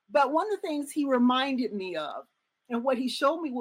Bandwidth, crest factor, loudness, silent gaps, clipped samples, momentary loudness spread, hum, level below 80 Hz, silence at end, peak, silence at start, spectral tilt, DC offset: 16 kHz; 16 dB; -28 LUFS; none; under 0.1%; 11 LU; none; -80 dBFS; 0 s; -12 dBFS; 0.1 s; -4 dB/octave; under 0.1%